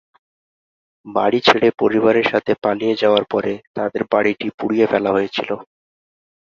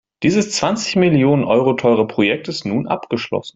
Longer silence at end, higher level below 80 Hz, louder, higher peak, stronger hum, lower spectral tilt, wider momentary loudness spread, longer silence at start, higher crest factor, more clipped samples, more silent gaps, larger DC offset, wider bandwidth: first, 0.85 s vs 0.05 s; about the same, -58 dBFS vs -54 dBFS; about the same, -18 LUFS vs -17 LUFS; about the same, 0 dBFS vs -2 dBFS; neither; about the same, -6 dB/octave vs -5.5 dB/octave; about the same, 10 LU vs 8 LU; first, 1.05 s vs 0.2 s; about the same, 18 dB vs 14 dB; neither; first, 3.67-3.74 s, 4.54-4.58 s vs none; neither; second, 7.4 kHz vs 8.2 kHz